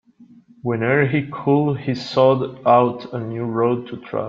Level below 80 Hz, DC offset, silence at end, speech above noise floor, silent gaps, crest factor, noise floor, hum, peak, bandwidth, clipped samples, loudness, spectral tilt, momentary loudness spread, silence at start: -58 dBFS; under 0.1%; 0 s; 30 dB; none; 18 dB; -48 dBFS; none; -2 dBFS; 7.4 kHz; under 0.1%; -19 LUFS; -8 dB/octave; 11 LU; 0.2 s